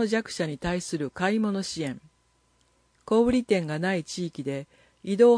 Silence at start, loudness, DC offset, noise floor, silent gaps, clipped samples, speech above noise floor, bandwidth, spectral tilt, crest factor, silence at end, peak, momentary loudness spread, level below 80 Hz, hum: 0 s; -27 LUFS; under 0.1%; -67 dBFS; none; under 0.1%; 42 dB; 10.5 kHz; -5.5 dB/octave; 18 dB; 0 s; -8 dBFS; 11 LU; -54 dBFS; none